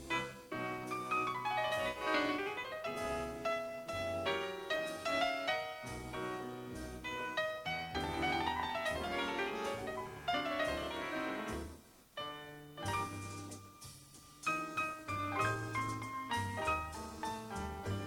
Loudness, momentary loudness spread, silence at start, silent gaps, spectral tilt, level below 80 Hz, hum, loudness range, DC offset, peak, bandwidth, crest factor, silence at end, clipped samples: -38 LUFS; 10 LU; 0 s; none; -4 dB/octave; -58 dBFS; none; 4 LU; under 0.1%; -22 dBFS; 18.5 kHz; 18 dB; 0 s; under 0.1%